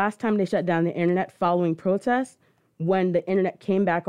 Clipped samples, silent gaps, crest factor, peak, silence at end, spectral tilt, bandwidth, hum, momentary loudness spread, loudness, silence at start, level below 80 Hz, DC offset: under 0.1%; none; 14 dB; -8 dBFS; 0.05 s; -8 dB/octave; 11 kHz; none; 2 LU; -24 LUFS; 0 s; -68 dBFS; under 0.1%